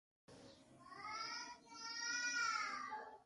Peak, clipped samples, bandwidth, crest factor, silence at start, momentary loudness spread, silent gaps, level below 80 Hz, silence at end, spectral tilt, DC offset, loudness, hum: -30 dBFS; under 0.1%; 11.5 kHz; 18 dB; 0.3 s; 23 LU; none; -84 dBFS; 0 s; 0.5 dB/octave; under 0.1%; -44 LUFS; none